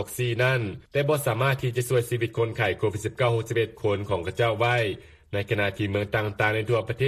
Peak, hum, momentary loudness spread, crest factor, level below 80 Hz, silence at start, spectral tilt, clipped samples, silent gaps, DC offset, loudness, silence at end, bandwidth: -10 dBFS; none; 5 LU; 16 dB; -54 dBFS; 0 s; -5.5 dB/octave; under 0.1%; none; under 0.1%; -26 LUFS; 0 s; 15 kHz